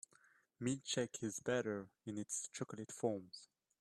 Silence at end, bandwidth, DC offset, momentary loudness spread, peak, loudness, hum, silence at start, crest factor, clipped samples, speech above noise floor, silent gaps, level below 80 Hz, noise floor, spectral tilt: 0.35 s; 13 kHz; under 0.1%; 9 LU; -24 dBFS; -43 LUFS; none; 0.6 s; 20 dB; under 0.1%; 29 dB; none; -80 dBFS; -72 dBFS; -4 dB/octave